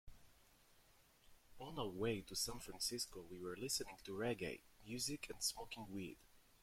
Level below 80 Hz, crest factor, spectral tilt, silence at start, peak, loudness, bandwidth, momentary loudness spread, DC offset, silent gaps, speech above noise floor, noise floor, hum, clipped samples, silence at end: -66 dBFS; 20 dB; -3 dB/octave; 0.05 s; -28 dBFS; -45 LUFS; 16.5 kHz; 10 LU; under 0.1%; none; 25 dB; -71 dBFS; none; under 0.1%; 0.2 s